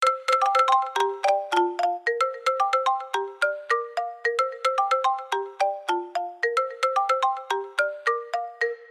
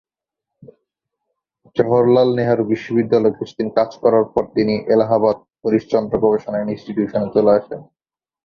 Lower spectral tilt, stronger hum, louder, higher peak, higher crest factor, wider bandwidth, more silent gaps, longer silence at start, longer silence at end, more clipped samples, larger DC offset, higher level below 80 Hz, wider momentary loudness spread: second, 0 dB/octave vs -8.5 dB/octave; neither; second, -25 LUFS vs -17 LUFS; second, -8 dBFS vs -2 dBFS; about the same, 16 dB vs 16 dB; first, 14 kHz vs 6.8 kHz; neither; second, 0 s vs 1.75 s; second, 0 s vs 0.6 s; neither; neither; second, -86 dBFS vs -54 dBFS; about the same, 7 LU vs 9 LU